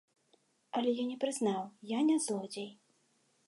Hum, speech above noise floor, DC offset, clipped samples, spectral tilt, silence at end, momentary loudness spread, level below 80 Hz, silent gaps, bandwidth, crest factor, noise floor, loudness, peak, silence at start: none; 40 dB; under 0.1%; under 0.1%; -4.5 dB/octave; 0.75 s; 12 LU; -88 dBFS; none; 11.5 kHz; 16 dB; -73 dBFS; -34 LUFS; -20 dBFS; 0.75 s